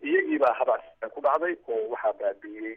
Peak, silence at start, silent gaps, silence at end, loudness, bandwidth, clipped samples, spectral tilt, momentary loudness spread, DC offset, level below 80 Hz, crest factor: -12 dBFS; 0 s; none; 0 s; -27 LUFS; 5.6 kHz; under 0.1%; -6 dB/octave; 8 LU; under 0.1%; -72 dBFS; 16 dB